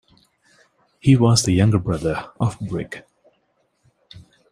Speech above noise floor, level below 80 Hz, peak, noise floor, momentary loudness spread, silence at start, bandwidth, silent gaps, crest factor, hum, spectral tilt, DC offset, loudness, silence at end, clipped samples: 49 dB; -48 dBFS; -2 dBFS; -67 dBFS; 14 LU; 1.05 s; 15 kHz; none; 20 dB; none; -6 dB/octave; under 0.1%; -19 LUFS; 0.3 s; under 0.1%